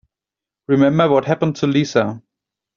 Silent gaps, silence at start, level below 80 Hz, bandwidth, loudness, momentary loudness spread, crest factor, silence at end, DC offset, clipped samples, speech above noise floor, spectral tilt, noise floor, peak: none; 0.7 s; -58 dBFS; 7.2 kHz; -17 LUFS; 8 LU; 16 dB; 0.6 s; under 0.1%; under 0.1%; 72 dB; -6 dB/octave; -87 dBFS; -2 dBFS